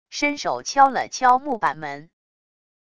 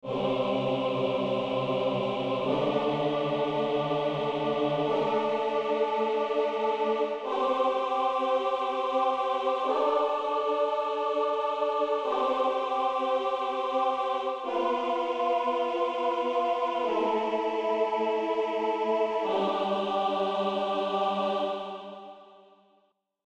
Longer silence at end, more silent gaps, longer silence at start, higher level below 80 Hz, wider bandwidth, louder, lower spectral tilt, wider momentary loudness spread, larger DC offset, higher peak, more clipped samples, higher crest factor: second, 0.8 s vs 1 s; neither; about the same, 0.1 s vs 0.05 s; first, -62 dBFS vs -68 dBFS; first, 10 kHz vs 9 kHz; first, -20 LUFS vs -28 LUFS; second, -2.5 dB/octave vs -6 dB/octave; first, 15 LU vs 2 LU; first, 0.4% vs under 0.1%; first, -2 dBFS vs -14 dBFS; neither; first, 20 dB vs 14 dB